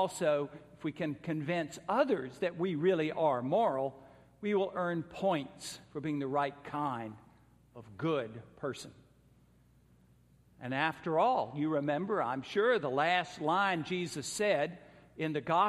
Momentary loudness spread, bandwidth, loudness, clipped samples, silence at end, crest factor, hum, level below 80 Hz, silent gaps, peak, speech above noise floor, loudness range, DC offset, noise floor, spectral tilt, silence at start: 12 LU; 15 kHz; -33 LUFS; under 0.1%; 0 s; 20 dB; none; -72 dBFS; none; -14 dBFS; 32 dB; 9 LU; under 0.1%; -65 dBFS; -5.5 dB/octave; 0 s